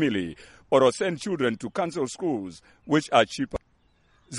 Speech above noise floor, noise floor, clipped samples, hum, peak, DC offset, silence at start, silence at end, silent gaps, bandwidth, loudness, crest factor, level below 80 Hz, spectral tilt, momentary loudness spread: 38 dB; -64 dBFS; under 0.1%; none; -4 dBFS; under 0.1%; 0 s; 0 s; none; 11.5 kHz; -25 LUFS; 22 dB; -56 dBFS; -5 dB/octave; 12 LU